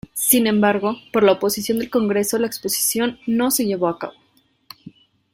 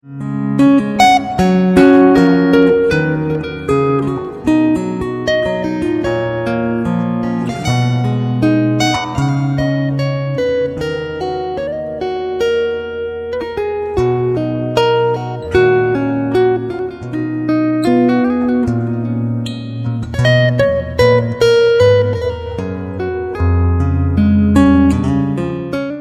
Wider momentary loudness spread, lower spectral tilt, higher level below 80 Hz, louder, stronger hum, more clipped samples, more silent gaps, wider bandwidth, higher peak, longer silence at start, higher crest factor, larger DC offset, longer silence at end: second, 7 LU vs 11 LU; second, -3.5 dB/octave vs -7 dB/octave; second, -58 dBFS vs -34 dBFS; second, -19 LUFS vs -15 LUFS; neither; neither; neither; first, 16.5 kHz vs 13.5 kHz; about the same, 0 dBFS vs 0 dBFS; about the same, 0.15 s vs 0.05 s; first, 20 dB vs 14 dB; neither; first, 0.45 s vs 0 s